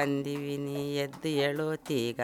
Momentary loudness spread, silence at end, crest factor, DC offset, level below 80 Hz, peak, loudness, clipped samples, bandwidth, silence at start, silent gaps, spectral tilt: 5 LU; 0 s; 16 dB; under 0.1%; -70 dBFS; -16 dBFS; -32 LUFS; under 0.1%; 19 kHz; 0 s; none; -5.5 dB/octave